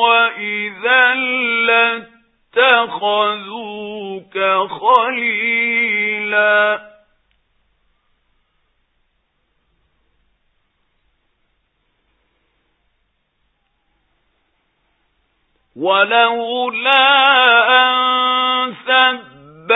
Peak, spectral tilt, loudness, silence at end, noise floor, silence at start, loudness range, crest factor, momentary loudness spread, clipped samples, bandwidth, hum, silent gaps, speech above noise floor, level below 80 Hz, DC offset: 0 dBFS; -5 dB/octave; -14 LUFS; 0 s; -66 dBFS; 0 s; 8 LU; 18 dB; 15 LU; under 0.1%; 4 kHz; none; none; 52 dB; -68 dBFS; under 0.1%